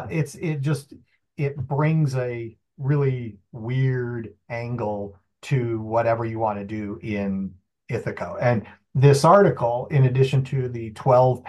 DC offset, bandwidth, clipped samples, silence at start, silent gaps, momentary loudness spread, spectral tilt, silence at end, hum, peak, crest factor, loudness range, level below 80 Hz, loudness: under 0.1%; 12 kHz; under 0.1%; 0 s; none; 15 LU; -7.5 dB/octave; 0 s; none; -4 dBFS; 20 dB; 7 LU; -60 dBFS; -23 LUFS